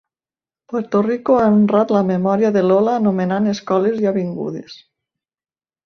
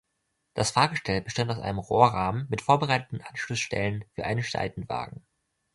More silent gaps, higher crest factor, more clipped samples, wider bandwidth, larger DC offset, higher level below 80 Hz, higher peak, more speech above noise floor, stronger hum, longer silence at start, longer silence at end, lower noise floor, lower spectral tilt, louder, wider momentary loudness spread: neither; second, 14 dB vs 24 dB; neither; second, 6.4 kHz vs 11.5 kHz; neither; second, -60 dBFS vs -52 dBFS; about the same, -2 dBFS vs -4 dBFS; first, over 74 dB vs 51 dB; neither; first, 0.7 s vs 0.55 s; first, 1.1 s vs 0.6 s; first, under -90 dBFS vs -78 dBFS; first, -8 dB/octave vs -4.5 dB/octave; first, -17 LUFS vs -27 LUFS; about the same, 12 LU vs 12 LU